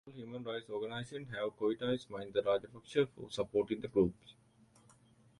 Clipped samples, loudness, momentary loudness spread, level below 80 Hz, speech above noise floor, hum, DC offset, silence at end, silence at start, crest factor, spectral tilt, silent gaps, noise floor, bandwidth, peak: under 0.1%; -37 LUFS; 10 LU; -66 dBFS; 29 dB; none; under 0.1%; 1.1 s; 0.05 s; 20 dB; -6.5 dB/octave; none; -66 dBFS; 11.5 kHz; -18 dBFS